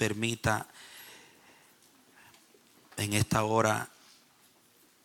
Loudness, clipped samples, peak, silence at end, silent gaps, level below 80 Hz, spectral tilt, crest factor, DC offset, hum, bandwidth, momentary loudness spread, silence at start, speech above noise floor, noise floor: -30 LUFS; under 0.1%; -12 dBFS; 1.15 s; none; -58 dBFS; -4.5 dB/octave; 22 dB; under 0.1%; none; 17.5 kHz; 21 LU; 0 s; 34 dB; -64 dBFS